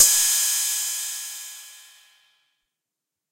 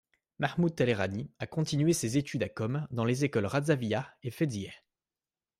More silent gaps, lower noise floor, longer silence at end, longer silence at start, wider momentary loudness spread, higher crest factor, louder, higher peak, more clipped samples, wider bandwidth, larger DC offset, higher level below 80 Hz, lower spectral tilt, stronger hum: neither; second, -86 dBFS vs under -90 dBFS; first, 1.5 s vs 0.85 s; second, 0 s vs 0.4 s; first, 22 LU vs 8 LU; about the same, 24 dB vs 20 dB; first, -20 LUFS vs -31 LUFS; first, -2 dBFS vs -12 dBFS; neither; about the same, 16 kHz vs 15 kHz; neither; about the same, -68 dBFS vs -66 dBFS; second, 4.5 dB/octave vs -6 dB/octave; neither